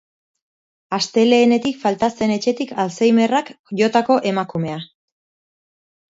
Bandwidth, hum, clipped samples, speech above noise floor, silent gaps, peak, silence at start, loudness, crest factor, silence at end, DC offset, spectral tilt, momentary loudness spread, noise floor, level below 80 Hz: 7.8 kHz; none; under 0.1%; over 73 dB; 3.59-3.64 s; -2 dBFS; 0.9 s; -18 LUFS; 18 dB; 1.3 s; under 0.1%; -5 dB/octave; 11 LU; under -90 dBFS; -62 dBFS